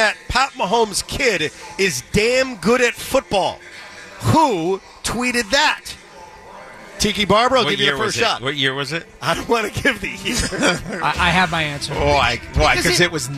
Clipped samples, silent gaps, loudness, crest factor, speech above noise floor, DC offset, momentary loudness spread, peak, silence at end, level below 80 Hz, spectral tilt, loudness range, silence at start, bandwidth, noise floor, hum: under 0.1%; none; -18 LUFS; 16 dB; 22 dB; under 0.1%; 10 LU; -4 dBFS; 0 s; -36 dBFS; -3.5 dB/octave; 2 LU; 0 s; 15 kHz; -40 dBFS; none